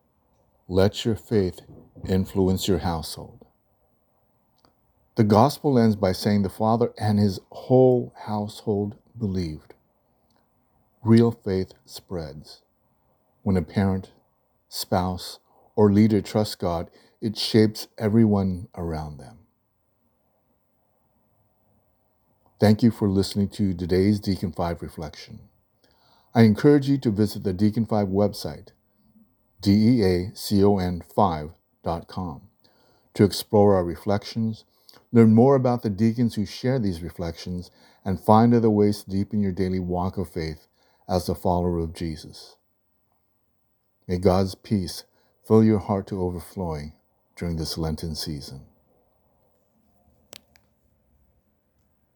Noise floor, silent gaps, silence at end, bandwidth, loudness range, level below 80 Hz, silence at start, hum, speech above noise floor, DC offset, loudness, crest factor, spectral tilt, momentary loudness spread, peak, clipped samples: -70 dBFS; none; 3.55 s; 20 kHz; 8 LU; -50 dBFS; 0.7 s; none; 48 dB; under 0.1%; -23 LUFS; 22 dB; -7 dB/octave; 17 LU; -2 dBFS; under 0.1%